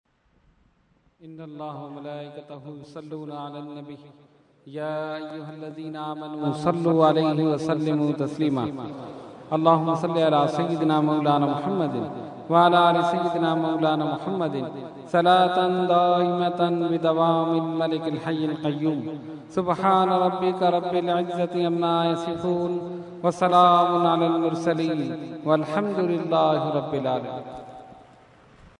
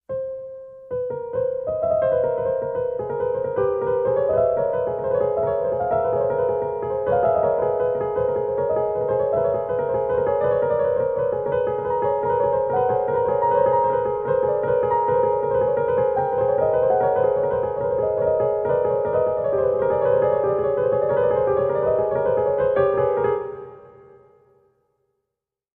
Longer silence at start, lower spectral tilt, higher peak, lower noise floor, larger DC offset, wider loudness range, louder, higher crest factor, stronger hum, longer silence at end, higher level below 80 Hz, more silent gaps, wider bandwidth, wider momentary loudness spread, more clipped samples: first, 1.25 s vs 0.1 s; second, -7 dB/octave vs -10.5 dB/octave; first, -4 dBFS vs -8 dBFS; second, -64 dBFS vs -84 dBFS; neither; first, 14 LU vs 3 LU; about the same, -23 LUFS vs -21 LUFS; first, 20 dB vs 14 dB; neither; second, 0.8 s vs 1.85 s; second, -66 dBFS vs -50 dBFS; neither; first, 10.5 kHz vs 3.6 kHz; first, 18 LU vs 5 LU; neither